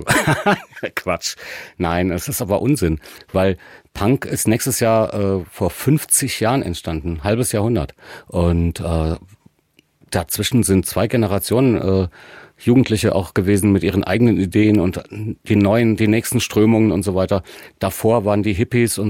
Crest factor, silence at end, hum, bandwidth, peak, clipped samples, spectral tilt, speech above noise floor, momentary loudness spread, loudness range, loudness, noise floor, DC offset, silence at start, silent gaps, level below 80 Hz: 16 dB; 0 s; none; 17 kHz; -2 dBFS; under 0.1%; -5.5 dB/octave; 41 dB; 10 LU; 4 LU; -18 LUFS; -59 dBFS; under 0.1%; 0 s; none; -38 dBFS